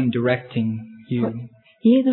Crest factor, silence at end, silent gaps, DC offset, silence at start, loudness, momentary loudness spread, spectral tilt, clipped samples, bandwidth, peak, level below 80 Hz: 16 dB; 0 s; none; under 0.1%; 0 s; -22 LUFS; 16 LU; -11.5 dB/octave; under 0.1%; 4.2 kHz; -6 dBFS; -62 dBFS